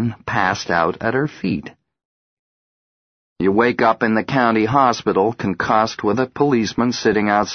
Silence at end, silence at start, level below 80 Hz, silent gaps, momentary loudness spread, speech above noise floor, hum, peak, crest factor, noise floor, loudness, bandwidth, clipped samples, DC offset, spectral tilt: 0 s; 0 s; -52 dBFS; 2.05-3.36 s; 6 LU; over 72 dB; none; 0 dBFS; 18 dB; under -90 dBFS; -18 LUFS; 6.6 kHz; under 0.1%; under 0.1%; -5.5 dB/octave